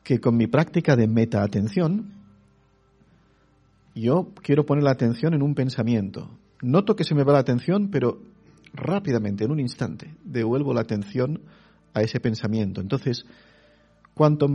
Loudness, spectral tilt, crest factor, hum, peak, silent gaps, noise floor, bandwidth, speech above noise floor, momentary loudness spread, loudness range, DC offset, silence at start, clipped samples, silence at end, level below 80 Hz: -23 LUFS; -8.5 dB/octave; 20 dB; none; -4 dBFS; none; -60 dBFS; 9.2 kHz; 38 dB; 13 LU; 5 LU; under 0.1%; 0.05 s; under 0.1%; 0 s; -58 dBFS